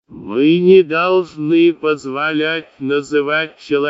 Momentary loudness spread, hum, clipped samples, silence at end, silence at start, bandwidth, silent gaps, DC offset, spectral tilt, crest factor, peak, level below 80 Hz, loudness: 10 LU; none; under 0.1%; 0 s; 0.1 s; 7.8 kHz; none; under 0.1%; -6.5 dB/octave; 14 dB; 0 dBFS; -62 dBFS; -15 LUFS